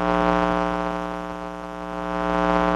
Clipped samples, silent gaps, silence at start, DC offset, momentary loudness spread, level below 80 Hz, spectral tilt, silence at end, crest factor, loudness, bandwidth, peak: under 0.1%; none; 0 s; under 0.1%; 12 LU; -40 dBFS; -6.5 dB/octave; 0 s; 20 dB; -24 LUFS; 11.5 kHz; -4 dBFS